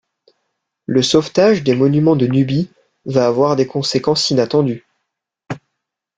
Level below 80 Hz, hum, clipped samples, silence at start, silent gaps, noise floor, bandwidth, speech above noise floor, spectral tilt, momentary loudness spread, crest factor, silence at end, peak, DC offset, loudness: -54 dBFS; none; under 0.1%; 0.9 s; none; -77 dBFS; 9.4 kHz; 63 dB; -6 dB/octave; 18 LU; 16 dB; 0.6 s; 0 dBFS; under 0.1%; -15 LUFS